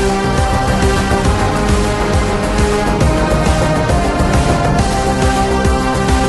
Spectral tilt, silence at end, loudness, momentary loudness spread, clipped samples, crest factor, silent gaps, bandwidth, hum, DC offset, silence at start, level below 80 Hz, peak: -5.5 dB/octave; 0 s; -14 LUFS; 1 LU; under 0.1%; 12 dB; none; 12 kHz; none; under 0.1%; 0 s; -18 dBFS; -2 dBFS